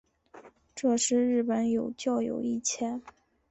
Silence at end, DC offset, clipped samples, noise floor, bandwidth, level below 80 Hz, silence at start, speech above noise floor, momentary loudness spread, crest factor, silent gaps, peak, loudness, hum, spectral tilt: 0.4 s; under 0.1%; under 0.1%; -54 dBFS; 8.4 kHz; -68 dBFS; 0.35 s; 26 dB; 9 LU; 14 dB; none; -16 dBFS; -29 LUFS; none; -3.5 dB/octave